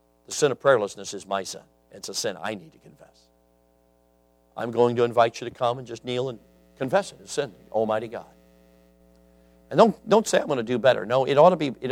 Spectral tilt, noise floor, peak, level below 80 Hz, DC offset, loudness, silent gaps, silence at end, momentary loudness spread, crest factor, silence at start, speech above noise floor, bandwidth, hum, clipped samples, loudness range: -4.5 dB/octave; -62 dBFS; -2 dBFS; -64 dBFS; under 0.1%; -24 LUFS; none; 0 s; 16 LU; 24 dB; 0.3 s; 39 dB; 15.5 kHz; none; under 0.1%; 11 LU